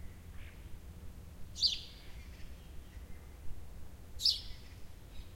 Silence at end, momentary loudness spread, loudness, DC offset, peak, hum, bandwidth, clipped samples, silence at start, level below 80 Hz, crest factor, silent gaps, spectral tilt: 0 s; 22 LU; -33 LUFS; under 0.1%; -16 dBFS; none; 16.5 kHz; under 0.1%; 0 s; -52 dBFS; 24 dB; none; -2 dB/octave